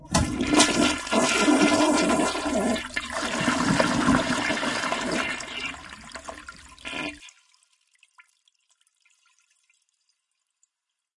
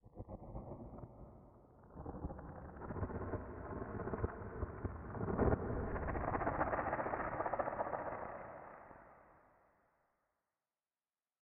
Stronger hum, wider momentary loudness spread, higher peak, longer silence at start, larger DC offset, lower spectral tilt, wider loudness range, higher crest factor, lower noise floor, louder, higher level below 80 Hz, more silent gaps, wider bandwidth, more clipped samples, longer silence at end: neither; about the same, 20 LU vs 18 LU; first, -4 dBFS vs -20 dBFS; about the same, 0 s vs 0.05 s; neither; about the same, -3.5 dB/octave vs -4 dB/octave; first, 18 LU vs 10 LU; about the same, 22 dB vs 24 dB; second, -83 dBFS vs under -90 dBFS; first, -23 LUFS vs -42 LUFS; first, -48 dBFS vs -54 dBFS; neither; first, 11.5 kHz vs 3.1 kHz; neither; first, 3.85 s vs 2.05 s